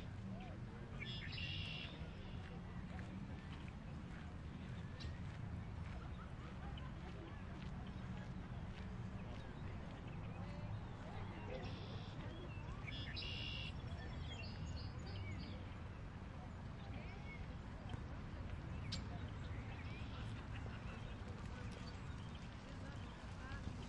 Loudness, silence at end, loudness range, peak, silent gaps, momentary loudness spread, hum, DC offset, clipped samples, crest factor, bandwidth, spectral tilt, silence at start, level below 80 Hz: -50 LUFS; 0 s; 3 LU; -30 dBFS; none; 5 LU; none; under 0.1%; under 0.1%; 18 dB; 10.5 kHz; -6 dB/octave; 0 s; -56 dBFS